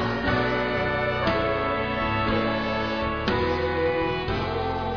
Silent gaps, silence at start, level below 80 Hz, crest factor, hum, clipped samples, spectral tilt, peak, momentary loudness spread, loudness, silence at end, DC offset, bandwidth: none; 0 s; -40 dBFS; 16 dB; none; under 0.1%; -7 dB/octave; -8 dBFS; 3 LU; -25 LUFS; 0 s; 0.4%; 5.4 kHz